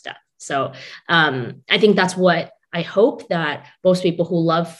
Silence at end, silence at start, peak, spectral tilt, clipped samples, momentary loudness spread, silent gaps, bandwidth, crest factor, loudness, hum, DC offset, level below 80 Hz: 0.05 s; 0.05 s; 0 dBFS; -5.5 dB/octave; under 0.1%; 12 LU; none; 12 kHz; 20 dB; -19 LUFS; none; under 0.1%; -66 dBFS